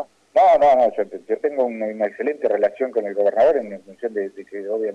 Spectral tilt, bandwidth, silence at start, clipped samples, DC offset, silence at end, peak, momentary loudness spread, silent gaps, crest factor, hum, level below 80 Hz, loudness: -6 dB/octave; 8 kHz; 0 s; under 0.1%; under 0.1%; 0 s; -8 dBFS; 14 LU; none; 12 dB; none; -60 dBFS; -20 LUFS